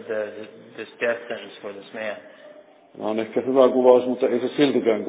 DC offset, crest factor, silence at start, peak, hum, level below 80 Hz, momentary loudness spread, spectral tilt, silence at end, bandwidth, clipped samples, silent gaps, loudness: under 0.1%; 22 dB; 0 s; -2 dBFS; none; -76 dBFS; 21 LU; -9.5 dB/octave; 0 s; 4 kHz; under 0.1%; none; -21 LUFS